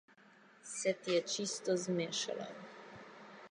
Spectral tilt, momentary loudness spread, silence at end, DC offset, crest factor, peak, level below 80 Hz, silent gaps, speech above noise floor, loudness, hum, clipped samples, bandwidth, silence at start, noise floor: -3.5 dB/octave; 19 LU; 0 s; under 0.1%; 18 dB; -22 dBFS; -86 dBFS; none; 26 dB; -37 LUFS; none; under 0.1%; 11 kHz; 0.65 s; -63 dBFS